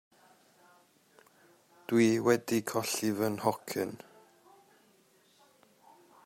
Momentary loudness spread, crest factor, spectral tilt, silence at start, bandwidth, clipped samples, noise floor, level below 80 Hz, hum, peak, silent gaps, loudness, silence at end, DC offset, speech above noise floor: 12 LU; 22 dB; -4.5 dB/octave; 1.9 s; 16.5 kHz; under 0.1%; -66 dBFS; -76 dBFS; none; -12 dBFS; none; -30 LUFS; 2.3 s; under 0.1%; 36 dB